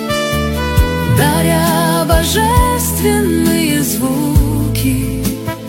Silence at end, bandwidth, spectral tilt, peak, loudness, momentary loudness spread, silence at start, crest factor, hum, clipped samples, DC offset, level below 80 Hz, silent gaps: 0 s; 16.5 kHz; -5 dB/octave; 0 dBFS; -13 LUFS; 4 LU; 0 s; 14 dB; none; under 0.1%; under 0.1%; -22 dBFS; none